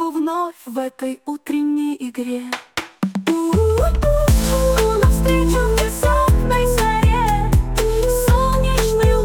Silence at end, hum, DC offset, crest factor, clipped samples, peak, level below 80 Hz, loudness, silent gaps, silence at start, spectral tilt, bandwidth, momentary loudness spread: 0 s; none; under 0.1%; 12 dB; under 0.1%; -4 dBFS; -20 dBFS; -18 LUFS; none; 0 s; -5.5 dB/octave; 18 kHz; 10 LU